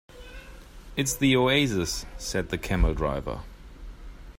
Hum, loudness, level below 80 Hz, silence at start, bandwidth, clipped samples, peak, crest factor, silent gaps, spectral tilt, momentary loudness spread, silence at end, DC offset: none; -26 LUFS; -36 dBFS; 0.1 s; 16 kHz; under 0.1%; -8 dBFS; 18 dB; none; -4.5 dB/octave; 25 LU; 0.05 s; under 0.1%